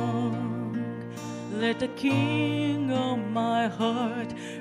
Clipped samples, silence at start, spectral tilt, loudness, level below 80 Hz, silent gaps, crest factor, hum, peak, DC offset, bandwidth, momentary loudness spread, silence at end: under 0.1%; 0 s; -6.5 dB/octave; -28 LUFS; -66 dBFS; none; 14 dB; none; -12 dBFS; under 0.1%; 12 kHz; 9 LU; 0 s